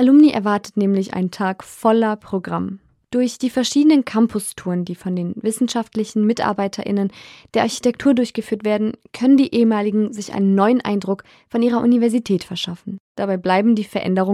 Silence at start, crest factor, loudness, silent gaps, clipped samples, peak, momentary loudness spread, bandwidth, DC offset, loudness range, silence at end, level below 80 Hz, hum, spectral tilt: 0 s; 14 dB; -19 LUFS; 13.00-13.15 s; under 0.1%; -4 dBFS; 10 LU; 13.5 kHz; under 0.1%; 3 LU; 0 s; -60 dBFS; none; -6 dB/octave